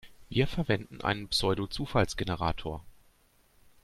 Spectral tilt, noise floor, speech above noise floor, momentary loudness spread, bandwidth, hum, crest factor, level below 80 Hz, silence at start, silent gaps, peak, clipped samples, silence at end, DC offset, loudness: -5 dB/octave; -65 dBFS; 35 dB; 7 LU; 15 kHz; none; 22 dB; -46 dBFS; 0.05 s; none; -10 dBFS; under 0.1%; 0.9 s; under 0.1%; -31 LUFS